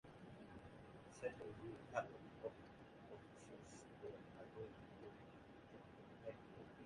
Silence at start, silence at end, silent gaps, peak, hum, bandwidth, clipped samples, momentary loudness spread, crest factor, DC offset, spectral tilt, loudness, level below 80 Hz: 0.05 s; 0 s; none; -28 dBFS; none; 11 kHz; under 0.1%; 13 LU; 26 dB; under 0.1%; -6 dB/octave; -56 LUFS; -76 dBFS